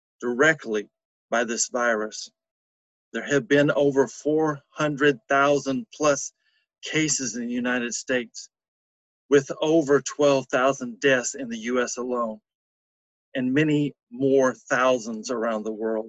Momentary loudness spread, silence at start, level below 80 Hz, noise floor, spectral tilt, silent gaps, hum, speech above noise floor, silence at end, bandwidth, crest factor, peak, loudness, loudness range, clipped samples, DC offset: 10 LU; 0.2 s; -66 dBFS; under -90 dBFS; -4 dB/octave; 1.05-1.29 s, 2.51-3.12 s, 8.68-9.29 s, 12.55-13.32 s, 14.03-14.07 s; none; over 67 dB; 0 s; 8.6 kHz; 18 dB; -6 dBFS; -24 LUFS; 4 LU; under 0.1%; under 0.1%